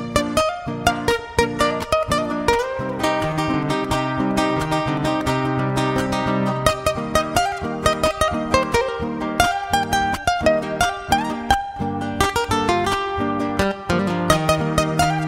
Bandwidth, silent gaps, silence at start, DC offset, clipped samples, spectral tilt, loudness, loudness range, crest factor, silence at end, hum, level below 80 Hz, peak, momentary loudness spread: 16 kHz; none; 0 s; under 0.1%; under 0.1%; -4.5 dB/octave; -20 LUFS; 1 LU; 20 dB; 0 s; none; -38 dBFS; 0 dBFS; 3 LU